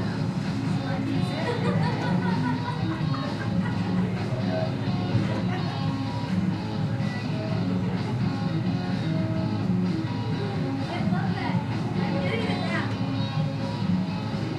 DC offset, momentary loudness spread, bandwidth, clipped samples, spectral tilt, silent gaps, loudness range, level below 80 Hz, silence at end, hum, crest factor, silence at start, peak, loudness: under 0.1%; 3 LU; 10.5 kHz; under 0.1%; -7.5 dB/octave; none; 1 LU; -52 dBFS; 0 s; none; 14 dB; 0 s; -12 dBFS; -27 LUFS